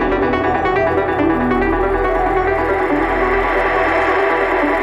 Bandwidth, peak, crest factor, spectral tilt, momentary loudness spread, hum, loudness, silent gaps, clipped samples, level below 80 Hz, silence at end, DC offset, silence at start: 12 kHz; -4 dBFS; 12 dB; -7 dB/octave; 2 LU; none; -16 LUFS; none; under 0.1%; -30 dBFS; 0 s; under 0.1%; 0 s